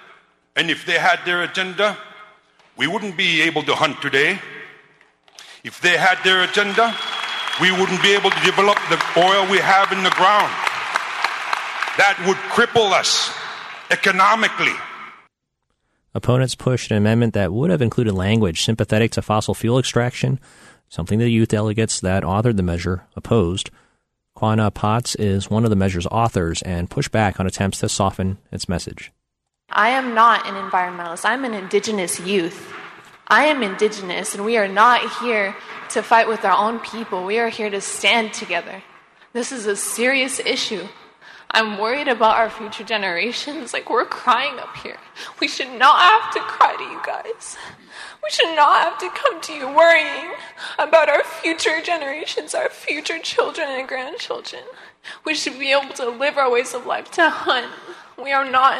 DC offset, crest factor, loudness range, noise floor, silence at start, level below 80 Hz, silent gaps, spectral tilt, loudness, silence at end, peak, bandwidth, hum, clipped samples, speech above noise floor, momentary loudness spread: under 0.1%; 18 dB; 5 LU; -77 dBFS; 0.55 s; -48 dBFS; none; -4 dB/octave; -18 LUFS; 0 s; -2 dBFS; 13.5 kHz; none; under 0.1%; 58 dB; 14 LU